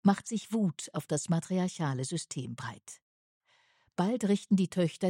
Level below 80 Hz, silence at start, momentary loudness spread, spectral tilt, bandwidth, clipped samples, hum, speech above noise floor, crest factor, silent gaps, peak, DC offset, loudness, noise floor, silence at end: -74 dBFS; 0.05 s; 14 LU; -6 dB/octave; 15.5 kHz; under 0.1%; none; 38 dB; 18 dB; 3.02-3.41 s; -12 dBFS; under 0.1%; -32 LUFS; -69 dBFS; 0 s